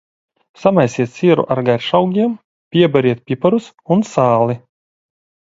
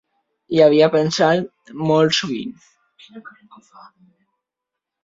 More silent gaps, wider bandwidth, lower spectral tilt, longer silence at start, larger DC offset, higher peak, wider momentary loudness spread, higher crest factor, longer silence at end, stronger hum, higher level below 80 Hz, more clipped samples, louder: first, 2.44-2.71 s vs none; about the same, 7.8 kHz vs 7.8 kHz; first, -7 dB/octave vs -5 dB/octave; about the same, 0.6 s vs 0.5 s; neither; about the same, 0 dBFS vs -2 dBFS; second, 6 LU vs 15 LU; about the same, 16 dB vs 18 dB; second, 0.9 s vs 1.75 s; neither; first, -56 dBFS vs -64 dBFS; neither; about the same, -15 LUFS vs -17 LUFS